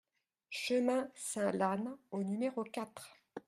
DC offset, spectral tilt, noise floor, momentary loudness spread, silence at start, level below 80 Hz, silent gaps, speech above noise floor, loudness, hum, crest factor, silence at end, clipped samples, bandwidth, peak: under 0.1%; -4.5 dB/octave; -57 dBFS; 13 LU; 0.5 s; -84 dBFS; none; 21 dB; -37 LUFS; none; 18 dB; 0.1 s; under 0.1%; 15.5 kHz; -18 dBFS